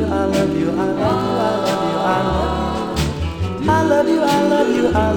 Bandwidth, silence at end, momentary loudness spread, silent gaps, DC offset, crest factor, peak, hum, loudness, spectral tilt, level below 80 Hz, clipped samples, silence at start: 19.5 kHz; 0 s; 6 LU; none; under 0.1%; 14 dB; -2 dBFS; none; -18 LUFS; -6 dB/octave; -34 dBFS; under 0.1%; 0 s